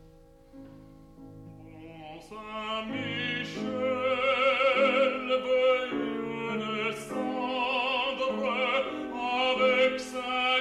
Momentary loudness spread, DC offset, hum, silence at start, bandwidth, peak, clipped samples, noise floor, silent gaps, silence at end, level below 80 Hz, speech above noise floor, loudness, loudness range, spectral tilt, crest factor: 20 LU; under 0.1%; none; 0.05 s; 12 kHz; -14 dBFS; under 0.1%; -54 dBFS; none; 0 s; -62 dBFS; 22 dB; -28 LUFS; 9 LU; -4 dB/octave; 16 dB